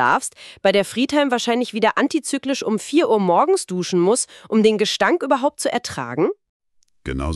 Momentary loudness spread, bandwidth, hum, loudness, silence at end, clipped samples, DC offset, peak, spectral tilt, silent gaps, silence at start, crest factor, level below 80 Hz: 7 LU; 13.5 kHz; none; -19 LUFS; 0 s; under 0.1%; under 0.1%; -4 dBFS; -4 dB/octave; 6.49-6.60 s; 0 s; 16 dB; -42 dBFS